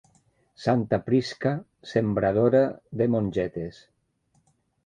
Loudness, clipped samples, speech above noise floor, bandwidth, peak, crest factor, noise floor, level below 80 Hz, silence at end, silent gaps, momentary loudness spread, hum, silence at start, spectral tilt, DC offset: -25 LUFS; under 0.1%; 44 dB; 9.6 kHz; -8 dBFS; 18 dB; -69 dBFS; -56 dBFS; 1.15 s; none; 10 LU; none; 0.6 s; -8 dB/octave; under 0.1%